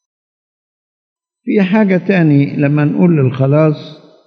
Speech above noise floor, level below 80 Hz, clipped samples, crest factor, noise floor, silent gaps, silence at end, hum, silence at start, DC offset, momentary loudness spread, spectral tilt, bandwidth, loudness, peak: over 79 dB; -66 dBFS; under 0.1%; 14 dB; under -90 dBFS; none; 0.3 s; none; 1.45 s; under 0.1%; 5 LU; -10 dB/octave; 6 kHz; -12 LUFS; 0 dBFS